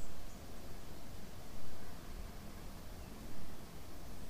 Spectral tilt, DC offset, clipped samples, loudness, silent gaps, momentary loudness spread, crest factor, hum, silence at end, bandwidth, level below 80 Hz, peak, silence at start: -4.5 dB/octave; under 0.1%; under 0.1%; -52 LUFS; none; 2 LU; 10 dB; none; 0 s; 15.5 kHz; -54 dBFS; -26 dBFS; 0 s